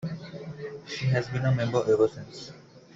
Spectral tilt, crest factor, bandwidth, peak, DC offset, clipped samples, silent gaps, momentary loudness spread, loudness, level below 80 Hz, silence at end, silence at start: -7 dB/octave; 18 dB; 7.8 kHz; -12 dBFS; under 0.1%; under 0.1%; none; 17 LU; -27 LUFS; -60 dBFS; 0.15 s; 0 s